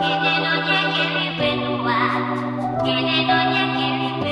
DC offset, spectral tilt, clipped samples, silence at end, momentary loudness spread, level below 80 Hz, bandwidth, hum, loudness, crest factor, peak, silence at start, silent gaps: under 0.1%; -6 dB/octave; under 0.1%; 0 s; 5 LU; -52 dBFS; 11 kHz; none; -19 LUFS; 14 dB; -6 dBFS; 0 s; none